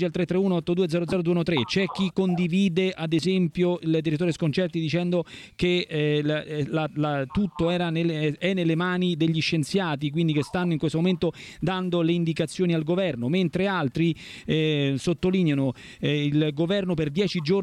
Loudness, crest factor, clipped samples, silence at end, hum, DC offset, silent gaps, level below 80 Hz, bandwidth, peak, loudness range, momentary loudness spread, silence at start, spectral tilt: -25 LUFS; 14 dB; under 0.1%; 0 s; none; under 0.1%; none; -54 dBFS; 11.5 kHz; -10 dBFS; 1 LU; 4 LU; 0 s; -7 dB/octave